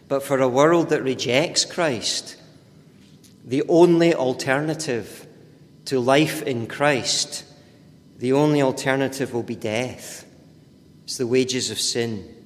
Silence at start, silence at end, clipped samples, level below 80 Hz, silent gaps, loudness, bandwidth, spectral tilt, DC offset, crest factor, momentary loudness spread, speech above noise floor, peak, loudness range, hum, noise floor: 0.1 s; 0.1 s; under 0.1%; -62 dBFS; none; -21 LUFS; 15.5 kHz; -4 dB/octave; under 0.1%; 20 dB; 13 LU; 29 dB; -2 dBFS; 4 LU; none; -50 dBFS